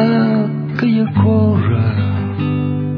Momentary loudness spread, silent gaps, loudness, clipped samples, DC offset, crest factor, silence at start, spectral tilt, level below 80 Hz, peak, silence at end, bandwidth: 6 LU; none; -15 LUFS; under 0.1%; under 0.1%; 12 dB; 0 s; -10.5 dB/octave; -48 dBFS; -2 dBFS; 0 s; 5.4 kHz